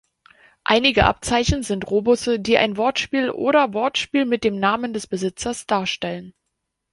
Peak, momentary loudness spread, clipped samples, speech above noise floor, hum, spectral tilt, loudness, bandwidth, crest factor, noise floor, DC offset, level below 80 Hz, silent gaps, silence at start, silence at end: -2 dBFS; 9 LU; under 0.1%; 57 dB; none; -4 dB/octave; -20 LUFS; 11.5 kHz; 20 dB; -77 dBFS; under 0.1%; -38 dBFS; none; 0.7 s; 0.65 s